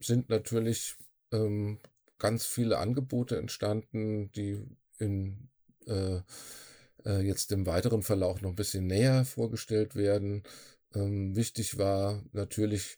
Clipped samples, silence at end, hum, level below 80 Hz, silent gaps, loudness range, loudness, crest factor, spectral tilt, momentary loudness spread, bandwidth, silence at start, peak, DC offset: under 0.1%; 0.05 s; none; -62 dBFS; none; 6 LU; -32 LUFS; 18 dB; -6 dB/octave; 12 LU; over 20 kHz; 0 s; -14 dBFS; under 0.1%